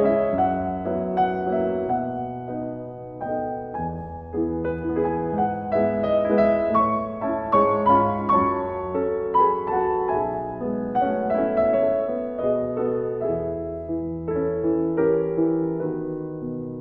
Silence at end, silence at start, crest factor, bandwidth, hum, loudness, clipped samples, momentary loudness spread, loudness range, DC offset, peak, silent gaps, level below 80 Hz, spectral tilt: 0 s; 0 s; 16 dB; 5.4 kHz; none; -24 LUFS; under 0.1%; 11 LU; 6 LU; under 0.1%; -6 dBFS; none; -48 dBFS; -10.5 dB/octave